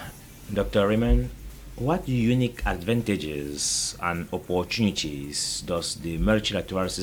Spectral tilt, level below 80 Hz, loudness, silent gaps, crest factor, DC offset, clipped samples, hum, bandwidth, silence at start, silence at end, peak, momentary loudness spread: -4.5 dB/octave; -34 dBFS; -26 LUFS; none; 18 dB; under 0.1%; under 0.1%; none; over 20 kHz; 0 s; 0 s; -8 dBFS; 8 LU